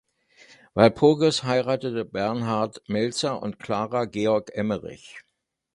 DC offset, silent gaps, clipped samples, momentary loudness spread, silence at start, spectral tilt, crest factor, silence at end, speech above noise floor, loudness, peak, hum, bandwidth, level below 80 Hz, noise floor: under 0.1%; none; under 0.1%; 13 LU; 0.75 s; -5.5 dB/octave; 24 dB; 0.55 s; 32 dB; -24 LUFS; -2 dBFS; none; 11.5 kHz; -58 dBFS; -55 dBFS